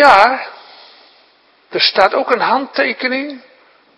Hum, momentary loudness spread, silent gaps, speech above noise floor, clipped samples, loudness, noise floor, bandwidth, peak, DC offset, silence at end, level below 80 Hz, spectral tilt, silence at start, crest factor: none; 16 LU; none; 39 dB; 0.4%; -14 LUFS; -52 dBFS; 11 kHz; 0 dBFS; under 0.1%; 0.6 s; -56 dBFS; -3.5 dB/octave; 0 s; 16 dB